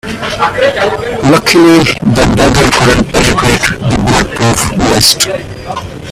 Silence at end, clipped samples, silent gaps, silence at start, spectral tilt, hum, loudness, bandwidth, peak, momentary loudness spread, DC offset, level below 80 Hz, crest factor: 0 s; 0.2%; none; 0.05 s; -4 dB/octave; none; -8 LUFS; over 20 kHz; 0 dBFS; 8 LU; under 0.1%; -24 dBFS; 10 dB